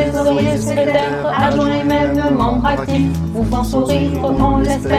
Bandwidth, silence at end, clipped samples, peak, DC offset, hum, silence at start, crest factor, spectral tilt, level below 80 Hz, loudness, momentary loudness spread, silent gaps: 15 kHz; 0 s; under 0.1%; -2 dBFS; under 0.1%; none; 0 s; 14 dB; -6.5 dB/octave; -28 dBFS; -16 LUFS; 3 LU; none